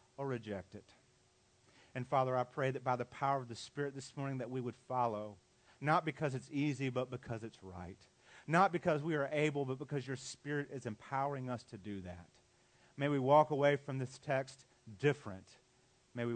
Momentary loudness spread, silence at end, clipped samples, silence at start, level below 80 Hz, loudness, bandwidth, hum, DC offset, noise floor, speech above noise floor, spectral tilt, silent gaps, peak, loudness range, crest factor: 18 LU; 0 s; under 0.1%; 0.2 s; -78 dBFS; -37 LUFS; 9 kHz; none; under 0.1%; -71 dBFS; 34 dB; -6.5 dB/octave; none; -16 dBFS; 5 LU; 22 dB